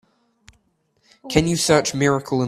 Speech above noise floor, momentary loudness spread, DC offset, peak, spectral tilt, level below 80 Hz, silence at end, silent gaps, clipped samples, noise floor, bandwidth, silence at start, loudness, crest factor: 47 dB; 3 LU; under 0.1%; 0 dBFS; -4.5 dB/octave; -46 dBFS; 0 s; none; under 0.1%; -65 dBFS; 15 kHz; 1.25 s; -19 LUFS; 22 dB